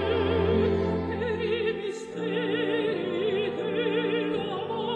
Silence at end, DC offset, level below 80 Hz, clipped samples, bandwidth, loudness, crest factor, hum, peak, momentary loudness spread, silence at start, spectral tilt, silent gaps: 0 s; under 0.1%; -48 dBFS; under 0.1%; 9.6 kHz; -28 LUFS; 14 dB; none; -12 dBFS; 6 LU; 0 s; -7 dB/octave; none